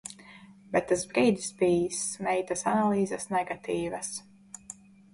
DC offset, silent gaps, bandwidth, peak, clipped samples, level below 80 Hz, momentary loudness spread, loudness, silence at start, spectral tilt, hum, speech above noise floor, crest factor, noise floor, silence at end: under 0.1%; none; 11.5 kHz; -12 dBFS; under 0.1%; -62 dBFS; 19 LU; -28 LUFS; 0.05 s; -4.5 dB/octave; none; 24 dB; 18 dB; -52 dBFS; 0.4 s